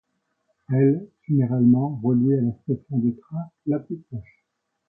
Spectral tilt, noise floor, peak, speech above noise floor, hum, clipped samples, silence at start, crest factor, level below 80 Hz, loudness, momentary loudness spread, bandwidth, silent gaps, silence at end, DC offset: -15 dB/octave; -76 dBFS; -8 dBFS; 54 dB; none; under 0.1%; 0.7 s; 16 dB; -60 dBFS; -23 LUFS; 15 LU; 2.5 kHz; none; 0.65 s; under 0.1%